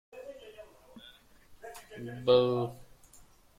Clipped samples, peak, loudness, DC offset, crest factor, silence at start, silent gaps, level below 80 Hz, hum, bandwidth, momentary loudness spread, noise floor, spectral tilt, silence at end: under 0.1%; -10 dBFS; -29 LUFS; under 0.1%; 24 dB; 0.15 s; none; -64 dBFS; none; 15.5 kHz; 27 LU; -58 dBFS; -6.5 dB/octave; 0.75 s